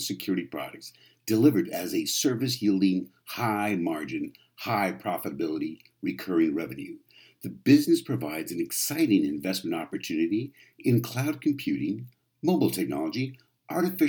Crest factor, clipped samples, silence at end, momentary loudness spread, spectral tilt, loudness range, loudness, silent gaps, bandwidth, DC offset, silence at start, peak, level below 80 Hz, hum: 20 dB; under 0.1%; 0 s; 15 LU; -5 dB/octave; 4 LU; -27 LUFS; none; 20 kHz; under 0.1%; 0 s; -8 dBFS; -70 dBFS; none